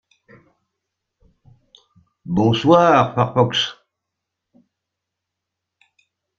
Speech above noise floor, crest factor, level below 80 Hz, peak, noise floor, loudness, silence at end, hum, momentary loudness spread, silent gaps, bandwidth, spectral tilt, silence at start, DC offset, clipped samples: 66 dB; 20 dB; -56 dBFS; -2 dBFS; -82 dBFS; -16 LUFS; 2.65 s; none; 10 LU; none; 7.6 kHz; -6 dB/octave; 2.25 s; under 0.1%; under 0.1%